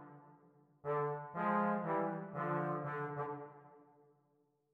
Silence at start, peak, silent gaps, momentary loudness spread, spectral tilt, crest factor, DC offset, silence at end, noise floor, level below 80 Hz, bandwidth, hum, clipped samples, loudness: 0 s; -24 dBFS; none; 14 LU; -10 dB/octave; 16 dB; under 0.1%; 0.9 s; -77 dBFS; -86 dBFS; 4.6 kHz; none; under 0.1%; -39 LUFS